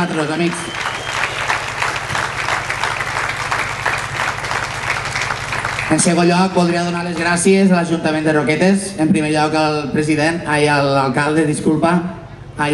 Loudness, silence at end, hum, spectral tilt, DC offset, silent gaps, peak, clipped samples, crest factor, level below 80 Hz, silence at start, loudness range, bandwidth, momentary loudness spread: -16 LUFS; 0 s; none; -4.5 dB/octave; under 0.1%; none; -2 dBFS; under 0.1%; 14 dB; -44 dBFS; 0 s; 4 LU; 12.5 kHz; 7 LU